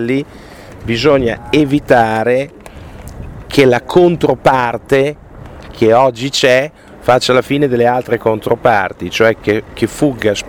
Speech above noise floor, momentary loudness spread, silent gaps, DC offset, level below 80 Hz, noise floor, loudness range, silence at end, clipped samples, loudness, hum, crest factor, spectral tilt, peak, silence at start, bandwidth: 20 dB; 17 LU; none; under 0.1%; -38 dBFS; -32 dBFS; 2 LU; 0 s; under 0.1%; -13 LUFS; none; 14 dB; -5.5 dB/octave; 0 dBFS; 0 s; 18 kHz